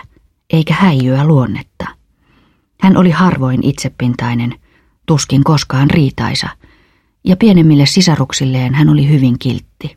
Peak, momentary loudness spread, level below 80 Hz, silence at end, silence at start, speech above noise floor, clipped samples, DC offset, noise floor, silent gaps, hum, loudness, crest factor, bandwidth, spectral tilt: 0 dBFS; 12 LU; -40 dBFS; 0.1 s; 0.55 s; 43 dB; under 0.1%; under 0.1%; -53 dBFS; none; none; -12 LUFS; 12 dB; 14 kHz; -6 dB/octave